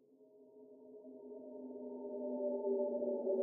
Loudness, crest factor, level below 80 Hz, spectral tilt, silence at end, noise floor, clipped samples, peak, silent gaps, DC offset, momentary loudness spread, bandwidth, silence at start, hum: -41 LUFS; 16 dB; under -90 dBFS; -11 dB/octave; 0 s; -64 dBFS; under 0.1%; -26 dBFS; none; under 0.1%; 22 LU; 1.1 kHz; 0.2 s; none